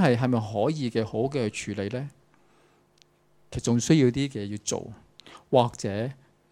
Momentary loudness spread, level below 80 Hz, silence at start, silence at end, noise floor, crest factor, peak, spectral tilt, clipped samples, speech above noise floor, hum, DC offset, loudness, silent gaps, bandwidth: 13 LU; -56 dBFS; 0 s; 0.4 s; -63 dBFS; 22 dB; -6 dBFS; -6 dB/octave; under 0.1%; 37 dB; 50 Hz at -60 dBFS; under 0.1%; -27 LUFS; none; 14 kHz